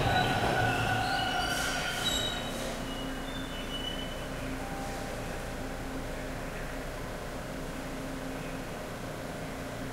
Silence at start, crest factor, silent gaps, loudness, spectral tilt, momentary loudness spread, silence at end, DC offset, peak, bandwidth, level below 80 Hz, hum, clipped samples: 0 s; 18 dB; none; -34 LUFS; -4 dB/octave; 11 LU; 0 s; under 0.1%; -16 dBFS; 16 kHz; -44 dBFS; none; under 0.1%